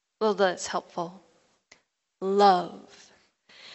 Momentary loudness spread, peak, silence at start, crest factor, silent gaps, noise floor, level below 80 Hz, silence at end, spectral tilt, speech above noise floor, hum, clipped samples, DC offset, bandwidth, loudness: 18 LU; -8 dBFS; 0.2 s; 22 dB; none; -62 dBFS; -76 dBFS; 0 s; -4 dB/octave; 37 dB; none; under 0.1%; under 0.1%; 8.2 kHz; -25 LUFS